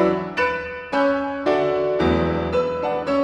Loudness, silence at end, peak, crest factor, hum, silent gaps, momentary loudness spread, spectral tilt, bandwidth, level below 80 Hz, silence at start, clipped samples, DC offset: -21 LUFS; 0 s; -4 dBFS; 16 dB; none; none; 4 LU; -7 dB/octave; 9.2 kHz; -46 dBFS; 0 s; under 0.1%; under 0.1%